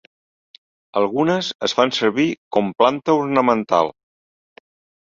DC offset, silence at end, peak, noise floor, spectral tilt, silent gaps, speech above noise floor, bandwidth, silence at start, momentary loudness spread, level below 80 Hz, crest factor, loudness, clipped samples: under 0.1%; 1.1 s; -2 dBFS; under -90 dBFS; -5 dB/octave; 1.55-1.59 s, 2.38-2.51 s; over 72 dB; 7.6 kHz; 0.95 s; 5 LU; -64 dBFS; 18 dB; -19 LUFS; under 0.1%